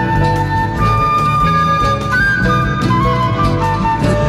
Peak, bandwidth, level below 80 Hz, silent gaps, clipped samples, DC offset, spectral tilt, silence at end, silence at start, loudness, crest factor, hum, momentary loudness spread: -2 dBFS; 14.5 kHz; -26 dBFS; none; under 0.1%; under 0.1%; -6.5 dB/octave; 0 s; 0 s; -14 LUFS; 12 dB; none; 3 LU